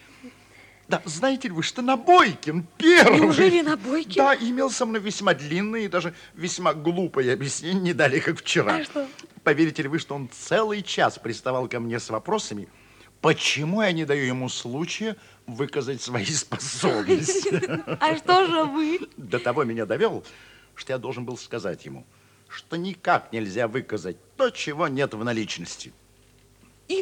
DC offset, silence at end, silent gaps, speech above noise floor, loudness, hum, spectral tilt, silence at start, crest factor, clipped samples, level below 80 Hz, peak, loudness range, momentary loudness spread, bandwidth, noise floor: under 0.1%; 0 s; none; 33 dB; -23 LUFS; none; -4.5 dB/octave; 0.25 s; 22 dB; under 0.1%; -66 dBFS; -2 dBFS; 10 LU; 14 LU; 14.5 kHz; -56 dBFS